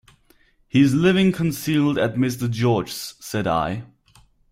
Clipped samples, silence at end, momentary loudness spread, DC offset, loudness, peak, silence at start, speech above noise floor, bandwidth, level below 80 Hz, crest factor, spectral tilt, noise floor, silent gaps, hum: under 0.1%; 0.65 s; 11 LU; under 0.1%; -21 LUFS; -4 dBFS; 0.75 s; 38 dB; 16 kHz; -52 dBFS; 18 dB; -6 dB/octave; -58 dBFS; none; none